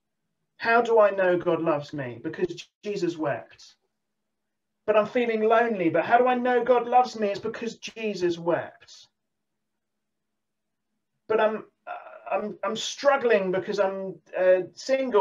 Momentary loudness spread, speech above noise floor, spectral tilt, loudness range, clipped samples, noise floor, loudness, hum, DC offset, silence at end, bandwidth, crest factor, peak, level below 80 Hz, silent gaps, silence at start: 14 LU; 60 dB; -5 dB/octave; 10 LU; under 0.1%; -85 dBFS; -25 LUFS; none; under 0.1%; 0 s; 7.8 kHz; 20 dB; -6 dBFS; -72 dBFS; 2.75-2.81 s; 0.6 s